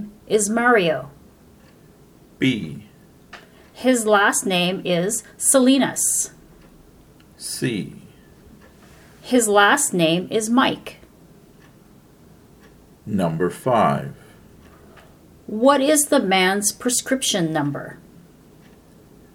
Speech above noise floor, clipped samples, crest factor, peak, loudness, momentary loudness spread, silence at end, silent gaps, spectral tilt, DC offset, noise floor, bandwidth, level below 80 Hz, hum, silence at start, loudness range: 31 dB; under 0.1%; 20 dB; -2 dBFS; -19 LUFS; 17 LU; 1.4 s; none; -3.5 dB/octave; under 0.1%; -50 dBFS; 19.5 kHz; -56 dBFS; none; 0 s; 7 LU